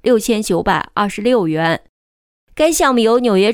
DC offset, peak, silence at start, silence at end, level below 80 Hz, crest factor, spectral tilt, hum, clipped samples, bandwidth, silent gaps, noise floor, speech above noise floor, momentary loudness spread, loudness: under 0.1%; -2 dBFS; 0.05 s; 0 s; -44 dBFS; 12 dB; -4.5 dB/octave; none; under 0.1%; 19.5 kHz; 1.89-2.47 s; under -90 dBFS; over 76 dB; 6 LU; -15 LUFS